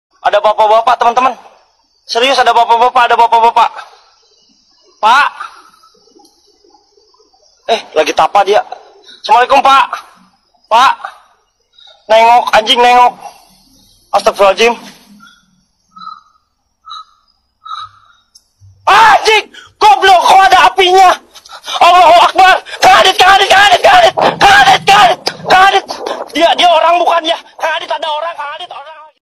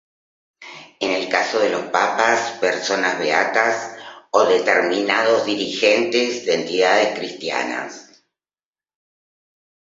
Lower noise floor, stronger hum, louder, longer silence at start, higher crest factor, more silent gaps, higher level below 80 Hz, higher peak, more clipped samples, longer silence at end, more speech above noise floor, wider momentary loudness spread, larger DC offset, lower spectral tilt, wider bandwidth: second, -59 dBFS vs under -90 dBFS; neither; first, -8 LUFS vs -19 LUFS; second, 0.25 s vs 0.6 s; second, 10 dB vs 20 dB; neither; first, -44 dBFS vs -70 dBFS; about the same, 0 dBFS vs 0 dBFS; neither; second, 0.35 s vs 1.8 s; second, 51 dB vs over 71 dB; first, 18 LU vs 10 LU; neither; about the same, -1.5 dB/octave vs -2.5 dB/octave; first, 16 kHz vs 7.8 kHz